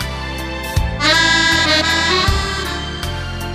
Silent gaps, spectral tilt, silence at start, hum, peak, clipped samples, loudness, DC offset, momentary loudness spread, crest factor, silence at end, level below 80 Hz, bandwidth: none; -3 dB/octave; 0 s; none; -2 dBFS; under 0.1%; -15 LUFS; under 0.1%; 12 LU; 16 dB; 0 s; -26 dBFS; 15.5 kHz